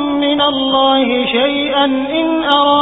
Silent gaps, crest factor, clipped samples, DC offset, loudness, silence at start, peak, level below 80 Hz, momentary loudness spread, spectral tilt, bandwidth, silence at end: none; 14 dB; under 0.1%; under 0.1%; -13 LUFS; 0 s; 0 dBFS; -46 dBFS; 3 LU; -6 dB/octave; 4 kHz; 0 s